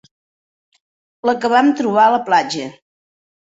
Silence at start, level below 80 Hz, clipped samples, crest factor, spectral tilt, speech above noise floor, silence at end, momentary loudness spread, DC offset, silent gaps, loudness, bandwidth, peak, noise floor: 1.25 s; -66 dBFS; under 0.1%; 16 dB; -4.5 dB/octave; over 75 dB; 0.8 s; 11 LU; under 0.1%; none; -15 LUFS; 8 kHz; -2 dBFS; under -90 dBFS